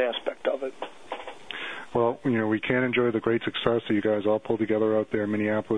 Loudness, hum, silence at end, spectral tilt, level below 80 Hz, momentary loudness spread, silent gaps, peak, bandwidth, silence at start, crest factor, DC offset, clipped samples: -26 LUFS; none; 0 s; -7 dB/octave; -62 dBFS; 13 LU; none; -4 dBFS; 10 kHz; 0 s; 22 dB; 0.2%; under 0.1%